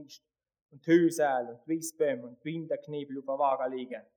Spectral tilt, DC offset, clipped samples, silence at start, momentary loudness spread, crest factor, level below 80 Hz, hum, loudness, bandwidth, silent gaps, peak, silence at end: -5.5 dB/octave; under 0.1%; under 0.1%; 0 s; 14 LU; 18 dB; -90 dBFS; none; -31 LUFS; 20 kHz; 0.62-0.69 s; -12 dBFS; 0.15 s